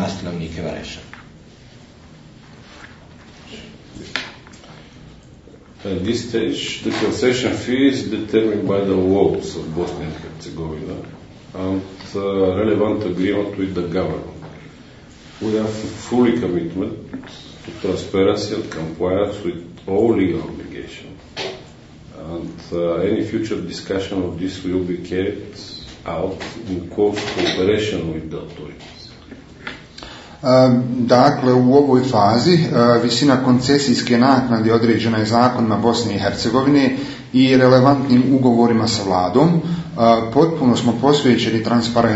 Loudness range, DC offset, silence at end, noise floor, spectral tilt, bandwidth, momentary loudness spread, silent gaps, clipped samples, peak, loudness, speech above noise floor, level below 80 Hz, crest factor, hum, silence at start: 11 LU; under 0.1%; 0 s; -43 dBFS; -6 dB/octave; 8 kHz; 19 LU; none; under 0.1%; 0 dBFS; -17 LUFS; 26 dB; -48 dBFS; 18 dB; none; 0 s